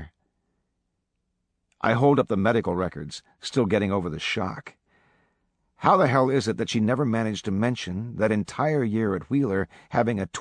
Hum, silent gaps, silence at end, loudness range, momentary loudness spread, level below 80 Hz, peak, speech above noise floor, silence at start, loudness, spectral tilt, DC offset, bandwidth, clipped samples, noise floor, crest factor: none; none; 0 s; 3 LU; 9 LU; -56 dBFS; -4 dBFS; 53 dB; 0 s; -24 LUFS; -6.5 dB/octave; under 0.1%; 10.5 kHz; under 0.1%; -77 dBFS; 22 dB